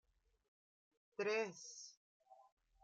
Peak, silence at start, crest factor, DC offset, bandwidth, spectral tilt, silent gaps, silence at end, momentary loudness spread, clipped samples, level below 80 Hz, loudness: -28 dBFS; 1.2 s; 20 dB; under 0.1%; 8 kHz; -2.5 dB/octave; 1.97-2.20 s; 0.4 s; 16 LU; under 0.1%; -88 dBFS; -44 LUFS